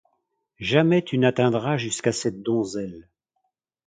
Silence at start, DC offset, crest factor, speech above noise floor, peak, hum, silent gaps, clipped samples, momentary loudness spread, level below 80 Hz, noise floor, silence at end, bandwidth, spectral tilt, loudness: 0.6 s; under 0.1%; 22 dB; 54 dB; -2 dBFS; none; none; under 0.1%; 11 LU; -60 dBFS; -76 dBFS; 0.85 s; 9.6 kHz; -5.5 dB/octave; -23 LUFS